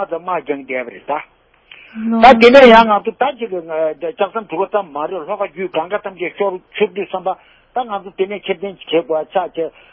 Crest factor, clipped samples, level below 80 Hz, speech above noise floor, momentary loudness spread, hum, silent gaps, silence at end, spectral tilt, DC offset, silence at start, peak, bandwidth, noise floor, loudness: 16 dB; 0.5%; -48 dBFS; 29 dB; 17 LU; none; none; 0.25 s; -5.5 dB/octave; under 0.1%; 0 s; 0 dBFS; 8 kHz; -44 dBFS; -15 LUFS